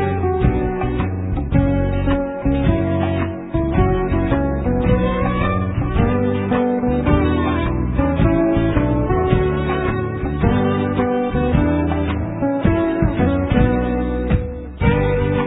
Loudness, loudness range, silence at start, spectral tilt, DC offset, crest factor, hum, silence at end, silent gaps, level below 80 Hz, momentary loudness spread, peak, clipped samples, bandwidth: -18 LUFS; 1 LU; 0 s; -12 dB/octave; under 0.1%; 16 dB; none; 0 s; none; -26 dBFS; 4 LU; -2 dBFS; under 0.1%; 4 kHz